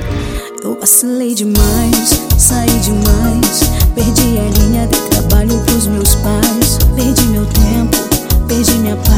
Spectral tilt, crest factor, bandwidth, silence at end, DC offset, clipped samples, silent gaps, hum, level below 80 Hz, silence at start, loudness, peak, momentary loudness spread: -4.5 dB/octave; 10 dB; over 20 kHz; 0 s; under 0.1%; 0.4%; none; none; -16 dBFS; 0 s; -11 LUFS; 0 dBFS; 5 LU